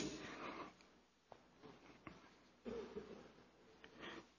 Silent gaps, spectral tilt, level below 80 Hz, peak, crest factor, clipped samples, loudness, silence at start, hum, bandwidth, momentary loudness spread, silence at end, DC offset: none; -4 dB/octave; -76 dBFS; -34 dBFS; 22 dB; under 0.1%; -55 LUFS; 0 s; none; 8 kHz; 16 LU; 0 s; under 0.1%